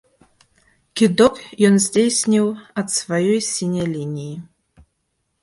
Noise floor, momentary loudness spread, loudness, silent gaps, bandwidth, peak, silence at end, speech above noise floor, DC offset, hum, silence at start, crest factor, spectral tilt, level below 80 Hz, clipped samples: -72 dBFS; 14 LU; -18 LUFS; none; 11.5 kHz; 0 dBFS; 1 s; 54 dB; under 0.1%; none; 0.95 s; 18 dB; -4.5 dB/octave; -56 dBFS; under 0.1%